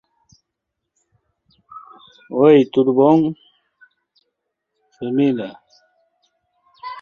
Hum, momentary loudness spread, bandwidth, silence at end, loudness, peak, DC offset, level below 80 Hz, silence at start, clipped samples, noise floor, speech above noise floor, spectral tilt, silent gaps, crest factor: none; 25 LU; 6.8 kHz; 0 s; -16 LUFS; -2 dBFS; under 0.1%; -66 dBFS; 1.75 s; under 0.1%; -79 dBFS; 65 dB; -9 dB/octave; none; 18 dB